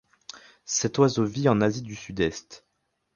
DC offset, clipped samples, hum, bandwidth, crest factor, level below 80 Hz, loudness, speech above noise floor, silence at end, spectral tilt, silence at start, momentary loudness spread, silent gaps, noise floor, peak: under 0.1%; under 0.1%; none; 10 kHz; 22 dB; -54 dBFS; -25 LUFS; 23 dB; 0.6 s; -5 dB/octave; 0.35 s; 22 LU; none; -48 dBFS; -6 dBFS